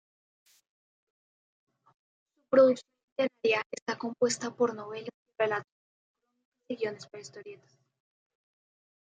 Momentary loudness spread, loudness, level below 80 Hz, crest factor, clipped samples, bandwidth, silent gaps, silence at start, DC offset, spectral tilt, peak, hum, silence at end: 22 LU; -29 LUFS; -84 dBFS; 22 dB; under 0.1%; 9.4 kHz; 3.03-3.16 s, 3.66-3.70 s, 3.82-3.86 s, 5.14-5.26 s, 5.72-6.15 s, 6.45-6.52 s; 2.5 s; under 0.1%; -3.5 dB/octave; -12 dBFS; none; 1.6 s